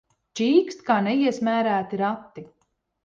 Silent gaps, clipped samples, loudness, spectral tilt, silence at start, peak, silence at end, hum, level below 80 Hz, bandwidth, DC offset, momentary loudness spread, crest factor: none; under 0.1%; -23 LUFS; -5.5 dB/octave; 0.35 s; -6 dBFS; 0.6 s; none; -70 dBFS; 7.6 kHz; under 0.1%; 17 LU; 18 dB